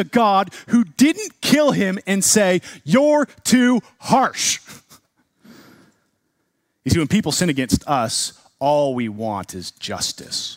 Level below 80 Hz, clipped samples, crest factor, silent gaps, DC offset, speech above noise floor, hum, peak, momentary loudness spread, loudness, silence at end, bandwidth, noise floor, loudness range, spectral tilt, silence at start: -48 dBFS; under 0.1%; 18 dB; none; under 0.1%; 52 dB; none; -2 dBFS; 10 LU; -18 LUFS; 0 s; 16 kHz; -70 dBFS; 7 LU; -4 dB/octave; 0 s